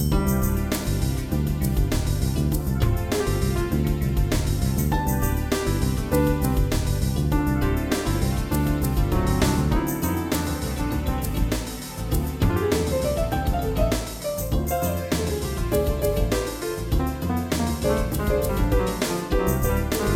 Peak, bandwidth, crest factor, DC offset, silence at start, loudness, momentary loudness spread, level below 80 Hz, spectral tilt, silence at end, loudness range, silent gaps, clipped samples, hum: -8 dBFS; 18.5 kHz; 16 dB; under 0.1%; 0 s; -24 LUFS; 4 LU; -28 dBFS; -6 dB/octave; 0 s; 2 LU; none; under 0.1%; none